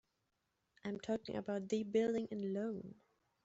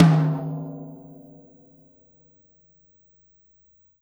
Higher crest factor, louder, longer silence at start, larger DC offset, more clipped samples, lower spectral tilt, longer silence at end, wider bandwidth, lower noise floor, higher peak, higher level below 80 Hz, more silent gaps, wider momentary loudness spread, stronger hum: second, 18 dB vs 24 dB; second, -41 LUFS vs -24 LUFS; first, 0.85 s vs 0 s; neither; neither; second, -6 dB/octave vs -9 dB/octave; second, 0.5 s vs 3.05 s; second, 8 kHz vs over 20 kHz; first, -85 dBFS vs -60 dBFS; second, -24 dBFS vs -2 dBFS; second, -78 dBFS vs -66 dBFS; neither; second, 12 LU vs 28 LU; neither